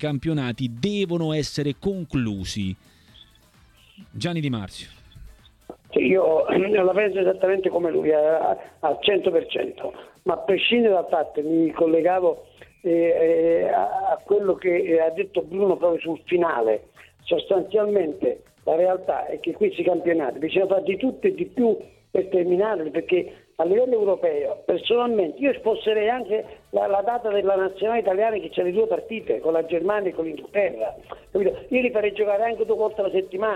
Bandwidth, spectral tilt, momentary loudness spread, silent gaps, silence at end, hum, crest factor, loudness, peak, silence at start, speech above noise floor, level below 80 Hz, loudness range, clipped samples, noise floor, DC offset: 11.5 kHz; -6.5 dB/octave; 9 LU; none; 0 s; none; 14 dB; -23 LUFS; -8 dBFS; 0 s; 33 dB; -56 dBFS; 5 LU; under 0.1%; -55 dBFS; under 0.1%